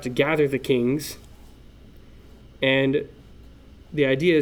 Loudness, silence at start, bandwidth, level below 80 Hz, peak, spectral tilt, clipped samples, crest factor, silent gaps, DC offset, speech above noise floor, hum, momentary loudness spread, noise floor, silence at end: -22 LUFS; 0 s; 19.5 kHz; -50 dBFS; -6 dBFS; -6 dB/octave; under 0.1%; 18 dB; none; under 0.1%; 25 dB; none; 14 LU; -47 dBFS; 0 s